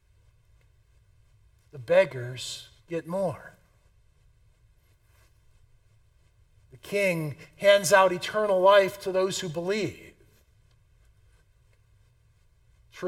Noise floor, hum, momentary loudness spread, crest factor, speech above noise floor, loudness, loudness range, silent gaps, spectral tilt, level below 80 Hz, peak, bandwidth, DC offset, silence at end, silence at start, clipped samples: -62 dBFS; none; 18 LU; 24 dB; 38 dB; -25 LUFS; 15 LU; none; -4 dB/octave; -64 dBFS; -6 dBFS; 16.5 kHz; under 0.1%; 0 s; 1.75 s; under 0.1%